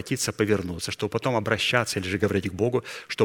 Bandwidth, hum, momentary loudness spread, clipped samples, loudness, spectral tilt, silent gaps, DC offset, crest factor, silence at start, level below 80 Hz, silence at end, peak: 17.5 kHz; none; 7 LU; under 0.1%; -26 LUFS; -4.5 dB/octave; none; under 0.1%; 22 dB; 0 s; -54 dBFS; 0 s; -4 dBFS